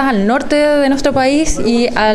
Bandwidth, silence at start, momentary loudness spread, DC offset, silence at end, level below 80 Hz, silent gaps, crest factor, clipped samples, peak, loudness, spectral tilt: 12.5 kHz; 0 s; 2 LU; under 0.1%; 0 s; -28 dBFS; none; 12 dB; under 0.1%; 0 dBFS; -13 LUFS; -4.5 dB/octave